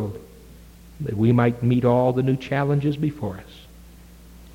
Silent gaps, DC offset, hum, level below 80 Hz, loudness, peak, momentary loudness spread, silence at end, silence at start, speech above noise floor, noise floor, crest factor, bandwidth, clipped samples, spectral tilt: none; under 0.1%; none; -48 dBFS; -22 LUFS; -6 dBFS; 14 LU; 0.05 s; 0 s; 25 dB; -45 dBFS; 16 dB; 16 kHz; under 0.1%; -9 dB/octave